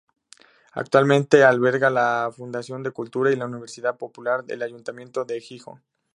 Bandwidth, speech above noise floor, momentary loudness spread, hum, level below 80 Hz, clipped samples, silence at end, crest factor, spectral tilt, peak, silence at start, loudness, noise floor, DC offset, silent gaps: 11 kHz; 32 dB; 17 LU; none; -72 dBFS; under 0.1%; 0.55 s; 22 dB; -6 dB/octave; -2 dBFS; 0.75 s; -22 LUFS; -54 dBFS; under 0.1%; none